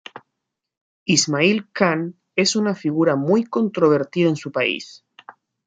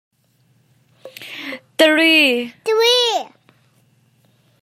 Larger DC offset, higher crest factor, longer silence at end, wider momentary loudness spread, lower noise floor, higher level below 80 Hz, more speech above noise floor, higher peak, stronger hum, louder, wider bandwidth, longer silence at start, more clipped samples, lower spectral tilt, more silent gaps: neither; about the same, 18 dB vs 18 dB; second, 0.35 s vs 1.35 s; second, 8 LU vs 21 LU; first, -80 dBFS vs -59 dBFS; first, -66 dBFS vs -78 dBFS; first, 61 dB vs 45 dB; about the same, -2 dBFS vs -2 dBFS; neither; second, -19 LUFS vs -14 LUFS; second, 9.6 kHz vs 16 kHz; second, 0.15 s vs 1.05 s; neither; first, -4 dB/octave vs -1 dB/octave; first, 0.77-1.06 s vs none